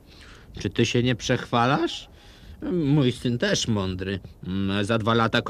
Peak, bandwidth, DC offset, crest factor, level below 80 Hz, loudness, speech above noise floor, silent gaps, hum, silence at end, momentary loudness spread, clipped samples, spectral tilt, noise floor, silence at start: -6 dBFS; 13.5 kHz; under 0.1%; 20 dB; -48 dBFS; -24 LUFS; 23 dB; none; none; 0 s; 11 LU; under 0.1%; -5.5 dB/octave; -47 dBFS; 0.15 s